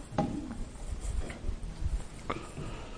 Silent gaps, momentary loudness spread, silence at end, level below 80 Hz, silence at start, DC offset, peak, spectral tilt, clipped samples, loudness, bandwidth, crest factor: none; 8 LU; 0 s; -38 dBFS; 0 s; under 0.1%; -12 dBFS; -6 dB/octave; under 0.1%; -39 LUFS; 10.5 kHz; 24 dB